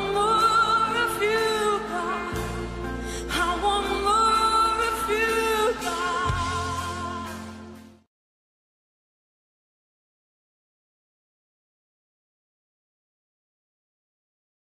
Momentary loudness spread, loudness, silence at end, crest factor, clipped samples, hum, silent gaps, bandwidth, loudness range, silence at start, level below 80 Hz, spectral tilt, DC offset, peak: 13 LU; -24 LUFS; 6.8 s; 16 dB; under 0.1%; none; none; 15 kHz; 12 LU; 0 s; -44 dBFS; -3.5 dB/octave; under 0.1%; -12 dBFS